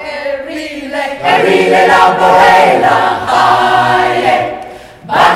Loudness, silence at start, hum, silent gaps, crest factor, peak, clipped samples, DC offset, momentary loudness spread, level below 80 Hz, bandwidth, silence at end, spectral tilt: -9 LUFS; 0 s; none; none; 10 dB; 0 dBFS; 0.5%; under 0.1%; 14 LU; -44 dBFS; 15.5 kHz; 0 s; -4 dB/octave